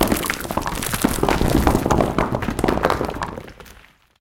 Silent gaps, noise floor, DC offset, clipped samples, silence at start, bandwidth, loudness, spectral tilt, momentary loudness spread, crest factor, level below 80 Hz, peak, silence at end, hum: none; -49 dBFS; under 0.1%; under 0.1%; 0 s; 17 kHz; -21 LUFS; -5 dB/octave; 10 LU; 20 dB; -30 dBFS; -2 dBFS; 0.45 s; none